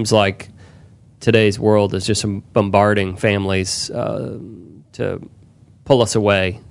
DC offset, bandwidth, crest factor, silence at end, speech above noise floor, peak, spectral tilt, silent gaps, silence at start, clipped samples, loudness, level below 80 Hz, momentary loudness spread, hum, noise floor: under 0.1%; 11.5 kHz; 18 dB; 0.1 s; 28 dB; 0 dBFS; -5 dB/octave; none; 0 s; under 0.1%; -17 LUFS; -50 dBFS; 14 LU; none; -46 dBFS